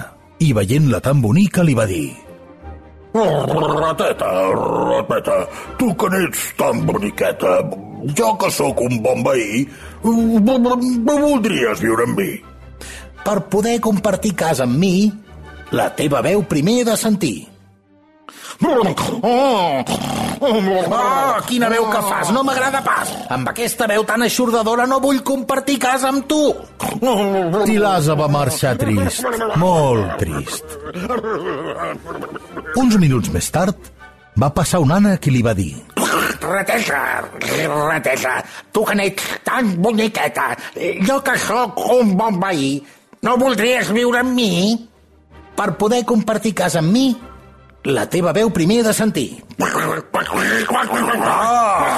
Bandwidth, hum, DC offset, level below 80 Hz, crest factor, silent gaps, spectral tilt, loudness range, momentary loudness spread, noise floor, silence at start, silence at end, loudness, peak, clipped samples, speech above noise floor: 14 kHz; none; under 0.1%; -44 dBFS; 12 dB; none; -5 dB/octave; 2 LU; 9 LU; -51 dBFS; 0 s; 0 s; -17 LUFS; -4 dBFS; under 0.1%; 35 dB